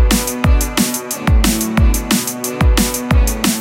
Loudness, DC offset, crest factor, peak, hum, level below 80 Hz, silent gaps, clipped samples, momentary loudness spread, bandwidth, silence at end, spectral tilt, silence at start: -15 LUFS; under 0.1%; 14 dB; 0 dBFS; none; -16 dBFS; none; under 0.1%; 3 LU; 17 kHz; 0 s; -4 dB/octave; 0 s